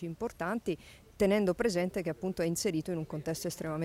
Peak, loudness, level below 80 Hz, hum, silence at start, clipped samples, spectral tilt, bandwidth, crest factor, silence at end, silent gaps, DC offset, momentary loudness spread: -16 dBFS; -33 LUFS; -58 dBFS; none; 0 s; under 0.1%; -5.5 dB/octave; 16 kHz; 16 dB; 0 s; none; under 0.1%; 9 LU